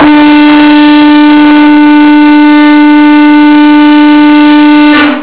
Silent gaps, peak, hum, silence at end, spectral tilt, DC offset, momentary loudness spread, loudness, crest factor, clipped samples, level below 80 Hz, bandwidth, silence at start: none; 0 dBFS; none; 0 s; -8 dB/octave; 4%; 0 LU; -2 LUFS; 2 dB; 6%; -40 dBFS; 4 kHz; 0 s